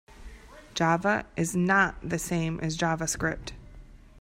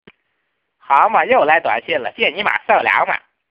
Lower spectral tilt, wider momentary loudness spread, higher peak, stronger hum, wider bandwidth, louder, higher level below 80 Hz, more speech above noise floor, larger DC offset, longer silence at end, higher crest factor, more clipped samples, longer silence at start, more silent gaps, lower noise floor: about the same, -4.5 dB/octave vs -5 dB/octave; about the same, 9 LU vs 7 LU; second, -8 dBFS vs 0 dBFS; neither; first, 16 kHz vs 5.6 kHz; second, -27 LUFS vs -15 LUFS; first, -48 dBFS vs -62 dBFS; second, 21 dB vs 55 dB; neither; second, 0 s vs 0.35 s; about the same, 20 dB vs 16 dB; neither; second, 0.1 s vs 0.9 s; neither; second, -48 dBFS vs -71 dBFS